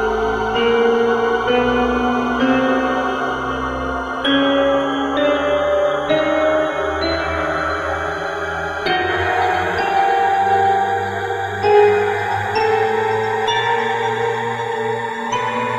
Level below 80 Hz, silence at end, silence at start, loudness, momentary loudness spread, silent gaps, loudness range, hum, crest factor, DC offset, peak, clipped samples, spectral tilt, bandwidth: -40 dBFS; 0 s; 0 s; -18 LUFS; 7 LU; none; 3 LU; none; 16 dB; under 0.1%; -2 dBFS; under 0.1%; -5 dB/octave; 13 kHz